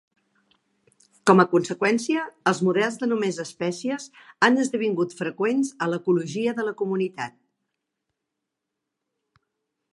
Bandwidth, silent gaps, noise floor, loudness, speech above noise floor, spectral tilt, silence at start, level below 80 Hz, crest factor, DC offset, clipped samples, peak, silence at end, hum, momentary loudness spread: 11.5 kHz; none; -83 dBFS; -23 LUFS; 60 dB; -5.5 dB/octave; 1.25 s; -76 dBFS; 24 dB; under 0.1%; under 0.1%; -2 dBFS; 2.65 s; none; 10 LU